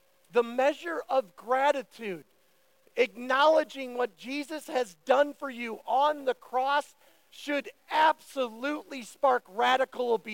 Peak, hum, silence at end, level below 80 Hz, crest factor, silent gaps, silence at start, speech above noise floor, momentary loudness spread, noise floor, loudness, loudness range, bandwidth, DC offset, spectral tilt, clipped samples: -10 dBFS; none; 0 s; -86 dBFS; 18 dB; none; 0.35 s; 39 dB; 12 LU; -68 dBFS; -29 LUFS; 2 LU; 17 kHz; under 0.1%; -3 dB/octave; under 0.1%